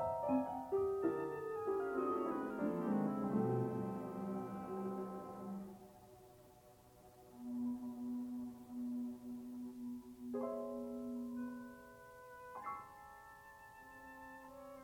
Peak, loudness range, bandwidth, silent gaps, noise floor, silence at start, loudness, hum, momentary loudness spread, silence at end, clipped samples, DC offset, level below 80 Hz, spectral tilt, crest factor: -24 dBFS; 10 LU; 19 kHz; none; -64 dBFS; 0 s; -42 LUFS; none; 20 LU; 0 s; under 0.1%; under 0.1%; -74 dBFS; -8.5 dB/octave; 18 dB